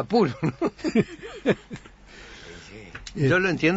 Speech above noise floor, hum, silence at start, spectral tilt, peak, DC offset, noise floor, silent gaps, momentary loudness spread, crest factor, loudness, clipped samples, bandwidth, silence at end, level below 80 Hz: 22 dB; none; 0 s; -6.5 dB/octave; -8 dBFS; under 0.1%; -46 dBFS; none; 21 LU; 18 dB; -25 LUFS; under 0.1%; 8 kHz; 0 s; -52 dBFS